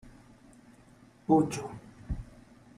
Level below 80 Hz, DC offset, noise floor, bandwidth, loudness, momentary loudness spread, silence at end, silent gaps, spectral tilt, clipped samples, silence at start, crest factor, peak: -50 dBFS; under 0.1%; -58 dBFS; 13 kHz; -31 LUFS; 21 LU; 0.55 s; none; -7 dB/octave; under 0.1%; 0.05 s; 24 dB; -10 dBFS